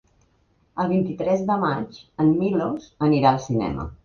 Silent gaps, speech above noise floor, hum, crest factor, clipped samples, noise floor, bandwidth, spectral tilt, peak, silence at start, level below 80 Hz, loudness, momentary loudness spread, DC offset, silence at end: none; 41 dB; none; 20 dB; under 0.1%; -63 dBFS; 7 kHz; -8 dB/octave; -4 dBFS; 0.75 s; -48 dBFS; -22 LUFS; 10 LU; under 0.1%; 0.1 s